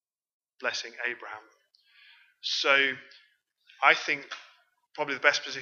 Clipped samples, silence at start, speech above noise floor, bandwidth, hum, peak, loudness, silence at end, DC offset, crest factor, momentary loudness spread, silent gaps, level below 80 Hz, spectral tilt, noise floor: under 0.1%; 0.6 s; 35 dB; 7.6 kHz; none; -4 dBFS; -26 LUFS; 0 s; under 0.1%; 28 dB; 20 LU; none; under -90 dBFS; -1 dB/octave; -63 dBFS